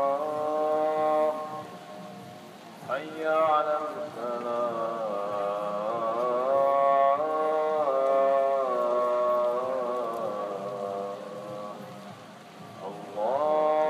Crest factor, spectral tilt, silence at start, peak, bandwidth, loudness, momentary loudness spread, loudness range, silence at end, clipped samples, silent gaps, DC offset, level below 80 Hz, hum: 14 dB; -5.5 dB/octave; 0 s; -12 dBFS; 13.5 kHz; -27 LUFS; 19 LU; 8 LU; 0 s; under 0.1%; none; under 0.1%; -84 dBFS; none